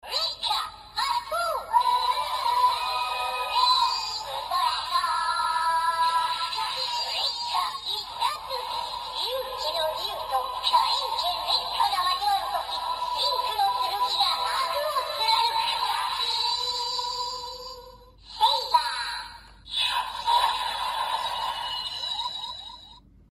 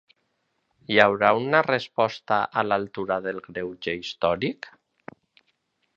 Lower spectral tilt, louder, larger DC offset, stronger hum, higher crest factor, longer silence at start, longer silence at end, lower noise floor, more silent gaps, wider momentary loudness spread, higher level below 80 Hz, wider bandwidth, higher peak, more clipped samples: second, 0.5 dB/octave vs -5.5 dB/octave; about the same, -26 LUFS vs -24 LUFS; neither; neither; second, 20 dB vs 26 dB; second, 0.05 s vs 0.9 s; second, 0.3 s vs 1.25 s; second, -50 dBFS vs -74 dBFS; neither; second, 8 LU vs 13 LU; about the same, -58 dBFS vs -62 dBFS; first, 15 kHz vs 7.6 kHz; second, -8 dBFS vs 0 dBFS; neither